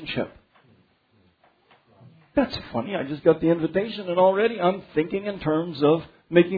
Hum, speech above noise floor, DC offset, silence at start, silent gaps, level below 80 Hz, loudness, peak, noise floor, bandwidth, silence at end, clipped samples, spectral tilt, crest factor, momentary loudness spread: none; 40 dB; under 0.1%; 0 s; none; -56 dBFS; -24 LUFS; -2 dBFS; -63 dBFS; 5 kHz; 0 s; under 0.1%; -9 dB/octave; 22 dB; 9 LU